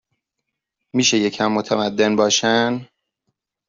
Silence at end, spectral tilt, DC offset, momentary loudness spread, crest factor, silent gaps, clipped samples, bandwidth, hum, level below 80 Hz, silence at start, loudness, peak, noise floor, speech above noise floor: 0.85 s; -3 dB/octave; under 0.1%; 7 LU; 18 dB; none; under 0.1%; 7.6 kHz; none; -62 dBFS; 0.95 s; -18 LUFS; -4 dBFS; -80 dBFS; 62 dB